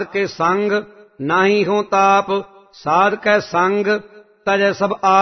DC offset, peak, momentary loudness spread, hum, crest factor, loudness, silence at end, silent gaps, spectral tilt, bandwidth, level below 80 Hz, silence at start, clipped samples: under 0.1%; -2 dBFS; 8 LU; none; 14 dB; -17 LUFS; 0 s; none; -5 dB/octave; 6.4 kHz; -60 dBFS; 0 s; under 0.1%